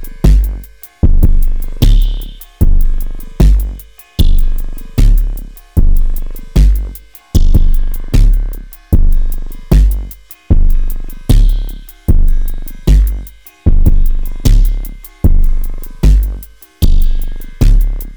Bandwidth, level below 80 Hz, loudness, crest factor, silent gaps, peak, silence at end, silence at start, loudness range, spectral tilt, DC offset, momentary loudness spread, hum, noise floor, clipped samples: over 20 kHz; -10 dBFS; -15 LUFS; 8 dB; none; 0 dBFS; 0 s; 0 s; 1 LU; -7 dB/octave; 0.5%; 14 LU; none; -28 dBFS; 0.1%